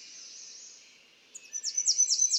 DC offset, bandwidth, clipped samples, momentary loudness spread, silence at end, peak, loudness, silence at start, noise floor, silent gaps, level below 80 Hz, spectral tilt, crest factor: under 0.1%; 18 kHz; under 0.1%; 25 LU; 0 s; -12 dBFS; -26 LUFS; 0 s; -58 dBFS; none; under -90 dBFS; 5.5 dB/octave; 20 dB